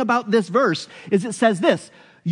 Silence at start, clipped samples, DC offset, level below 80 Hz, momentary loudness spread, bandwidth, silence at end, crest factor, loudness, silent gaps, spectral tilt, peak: 0 s; under 0.1%; under 0.1%; -74 dBFS; 9 LU; 11 kHz; 0 s; 16 dB; -20 LUFS; none; -5.5 dB/octave; -4 dBFS